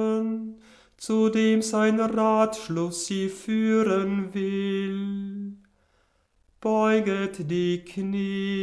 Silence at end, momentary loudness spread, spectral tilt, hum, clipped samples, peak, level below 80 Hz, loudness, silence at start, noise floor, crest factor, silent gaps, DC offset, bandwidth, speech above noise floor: 0 s; 10 LU; -5.5 dB/octave; none; under 0.1%; -10 dBFS; -64 dBFS; -25 LUFS; 0 s; -67 dBFS; 16 dB; none; under 0.1%; 11 kHz; 43 dB